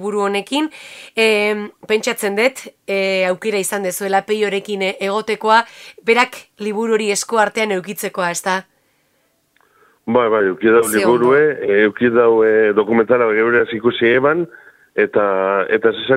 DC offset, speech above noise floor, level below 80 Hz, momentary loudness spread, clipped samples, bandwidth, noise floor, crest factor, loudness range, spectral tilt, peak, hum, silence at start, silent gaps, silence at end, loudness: under 0.1%; 46 dB; -60 dBFS; 9 LU; under 0.1%; 16 kHz; -62 dBFS; 16 dB; 6 LU; -4 dB/octave; 0 dBFS; none; 0 s; none; 0 s; -16 LUFS